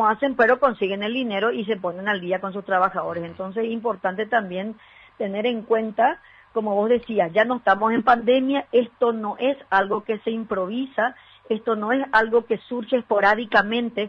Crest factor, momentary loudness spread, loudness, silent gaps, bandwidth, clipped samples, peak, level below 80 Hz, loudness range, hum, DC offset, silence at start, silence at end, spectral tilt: 18 dB; 9 LU; -22 LUFS; none; 6.6 kHz; under 0.1%; -4 dBFS; -60 dBFS; 4 LU; none; under 0.1%; 0 s; 0 s; -7 dB/octave